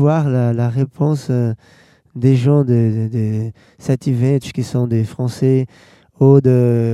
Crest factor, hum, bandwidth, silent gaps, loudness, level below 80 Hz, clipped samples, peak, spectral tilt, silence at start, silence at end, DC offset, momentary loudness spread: 16 dB; none; 11.5 kHz; none; -16 LUFS; -56 dBFS; under 0.1%; 0 dBFS; -9 dB/octave; 0 s; 0 s; under 0.1%; 10 LU